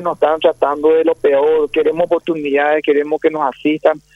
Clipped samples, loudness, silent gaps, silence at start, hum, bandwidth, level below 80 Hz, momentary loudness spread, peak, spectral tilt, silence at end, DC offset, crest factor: under 0.1%; -15 LUFS; none; 0 s; none; 11.5 kHz; -54 dBFS; 4 LU; 0 dBFS; -6.5 dB/octave; 0.15 s; under 0.1%; 14 dB